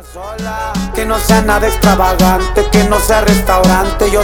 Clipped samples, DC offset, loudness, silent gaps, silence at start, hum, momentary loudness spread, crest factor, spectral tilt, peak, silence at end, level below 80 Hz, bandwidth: under 0.1%; under 0.1%; -11 LUFS; none; 0 s; none; 9 LU; 10 dB; -5 dB/octave; 0 dBFS; 0 s; -18 dBFS; 19.5 kHz